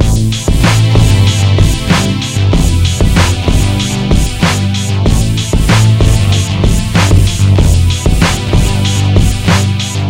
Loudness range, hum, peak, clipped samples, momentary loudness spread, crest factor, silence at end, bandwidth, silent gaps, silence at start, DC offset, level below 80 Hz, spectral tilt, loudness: 1 LU; none; 0 dBFS; 0.6%; 4 LU; 8 dB; 0 s; 16.5 kHz; none; 0 s; under 0.1%; -16 dBFS; -5 dB/octave; -10 LUFS